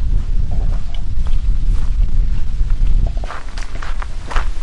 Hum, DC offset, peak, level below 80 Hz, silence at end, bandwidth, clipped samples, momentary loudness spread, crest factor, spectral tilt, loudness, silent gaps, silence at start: none; under 0.1%; -2 dBFS; -16 dBFS; 0 s; 6.6 kHz; under 0.1%; 8 LU; 10 dB; -6 dB/octave; -23 LUFS; none; 0 s